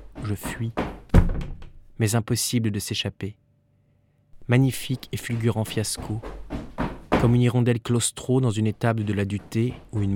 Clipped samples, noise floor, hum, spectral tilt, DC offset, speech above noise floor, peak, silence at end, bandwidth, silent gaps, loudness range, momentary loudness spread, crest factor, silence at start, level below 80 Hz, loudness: under 0.1%; -63 dBFS; none; -5.5 dB/octave; under 0.1%; 39 dB; -4 dBFS; 0 s; 17 kHz; none; 4 LU; 12 LU; 20 dB; 0 s; -34 dBFS; -25 LUFS